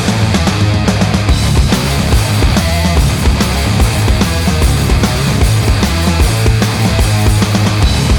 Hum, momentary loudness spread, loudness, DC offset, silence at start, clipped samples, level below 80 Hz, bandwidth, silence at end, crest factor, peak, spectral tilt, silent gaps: none; 1 LU; -12 LUFS; under 0.1%; 0 s; under 0.1%; -16 dBFS; 20 kHz; 0 s; 10 dB; 0 dBFS; -5 dB/octave; none